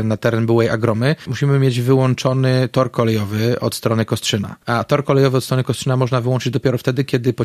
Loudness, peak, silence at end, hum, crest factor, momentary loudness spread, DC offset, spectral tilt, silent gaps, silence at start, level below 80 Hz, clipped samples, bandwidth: -17 LUFS; 0 dBFS; 0 s; none; 16 dB; 4 LU; under 0.1%; -6.5 dB/octave; none; 0 s; -52 dBFS; under 0.1%; 14.5 kHz